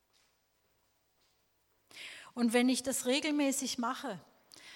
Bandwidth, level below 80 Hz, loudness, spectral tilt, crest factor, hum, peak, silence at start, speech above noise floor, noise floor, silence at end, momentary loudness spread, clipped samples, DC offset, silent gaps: 17 kHz; -78 dBFS; -32 LUFS; -2.5 dB/octave; 22 dB; none; -16 dBFS; 1.95 s; 43 dB; -75 dBFS; 0 s; 18 LU; under 0.1%; under 0.1%; none